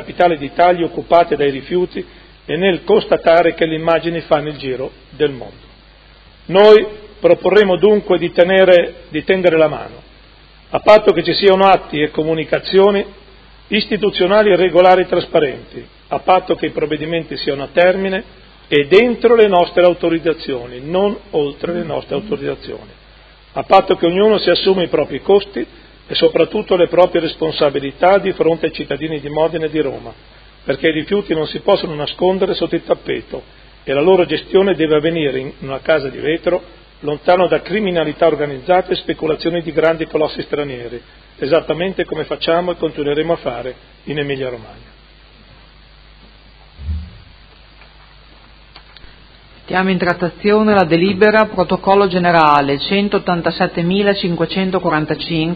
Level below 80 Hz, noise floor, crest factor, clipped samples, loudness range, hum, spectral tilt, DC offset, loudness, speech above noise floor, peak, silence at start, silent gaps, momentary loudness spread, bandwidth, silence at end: -42 dBFS; -44 dBFS; 16 dB; under 0.1%; 9 LU; none; -8 dB/octave; under 0.1%; -15 LUFS; 29 dB; 0 dBFS; 0 s; none; 14 LU; 6.2 kHz; 0 s